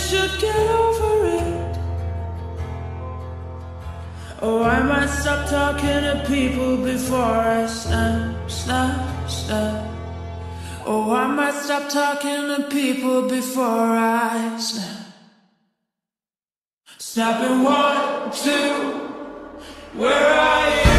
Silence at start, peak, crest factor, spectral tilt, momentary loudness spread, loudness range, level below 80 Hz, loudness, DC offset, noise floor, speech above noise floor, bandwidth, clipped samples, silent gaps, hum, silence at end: 0 s; -2 dBFS; 18 dB; -4.5 dB/octave; 15 LU; 5 LU; -34 dBFS; -21 LUFS; under 0.1%; under -90 dBFS; over 70 dB; 14 kHz; under 0.1%; 16.58-16.81 s; none; 0 s